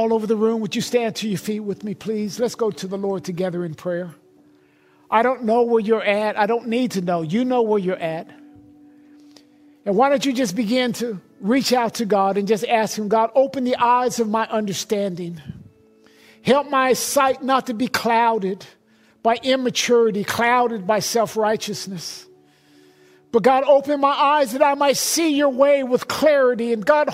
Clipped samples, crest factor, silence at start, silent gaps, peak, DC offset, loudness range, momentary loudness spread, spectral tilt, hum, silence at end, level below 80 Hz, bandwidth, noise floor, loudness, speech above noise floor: under 0.1%; 18 dB; 0 s; none; -2 dBFS; under 0.1%; 6 LU; 10 LU; -4 dB/octave; none; 0 s; -64 dBFS; 16 kHz; -55 dBFS; -20 LUFS; 36 dB